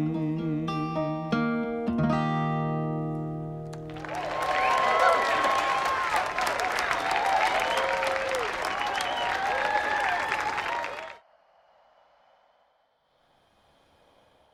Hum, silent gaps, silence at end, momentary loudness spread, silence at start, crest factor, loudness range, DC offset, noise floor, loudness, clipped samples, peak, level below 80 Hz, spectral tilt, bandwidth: none; none; 3.35 s; 10 LU; 0 s; 20 dB; 6 LU; under 0.1%; -69 dBFS; -27 LUFS; under 0.1%; -8 dBFS; -56 dBFS; -5 dB/octave; 16 kHz